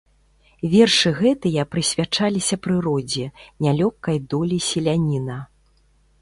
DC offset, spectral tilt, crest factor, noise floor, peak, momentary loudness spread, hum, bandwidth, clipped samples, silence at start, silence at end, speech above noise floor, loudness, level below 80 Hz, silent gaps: under 0.1%; -5 dB/octave; 18 dB; -59 dBFS; -4 dBFS; 11 LU; none; 11.5 kHz; under 0.1%; 0.65 s; 0.75 s; 38 dB; -20 LUFS; -50 dBFS; none